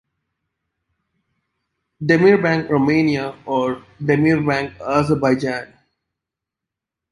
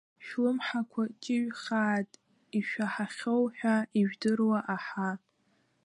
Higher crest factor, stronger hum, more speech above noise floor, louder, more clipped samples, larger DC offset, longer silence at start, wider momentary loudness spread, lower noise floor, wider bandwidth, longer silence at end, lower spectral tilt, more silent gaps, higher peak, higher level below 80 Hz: about the same, 18 dB vs 16 dB; neither; first, 68 dB vs 41 dB; first, -18 LUFS vs -31 LUFS; neither; neither; first, 2 s vs 0.2 s; first, 11 LU vs 7 LU; first, -85 dBFS vs -72 dBFS; about the same, 11.5 kHz vs 11 kHz; first, 1.45 s vs 0.65 s; first, -7.5 dB/octave vs -6 dB/octave; neither; first, -2 dBFS vs -16 dBFS; first, -52 dBFS vs -82 dBFS